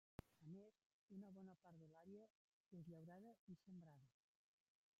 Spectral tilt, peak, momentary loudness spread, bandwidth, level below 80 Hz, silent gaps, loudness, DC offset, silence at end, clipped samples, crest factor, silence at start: -8.5 dB/octave; -38 dBFS; 5 LU; 7.4 kHz; -86 dBFS; 0.86-1.08 s, 2.30-2.71 s, 3.39-3.47 s; -64 LUFS; under 0.1%; 0.9 s; under 0.1%; 26 dB; 0.2 s